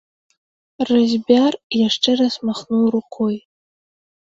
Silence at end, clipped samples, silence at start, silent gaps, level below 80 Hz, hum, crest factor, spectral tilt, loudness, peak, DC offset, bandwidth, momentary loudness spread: 0.85 s; under 0.1%; 0.8 s; 1.63-1.70 s; -62 dBFS; none; 20 dB; -5 dB/octave; -18 LUFS; 0 dBFS; under 0.1%; 7.8 kHz; 8 LU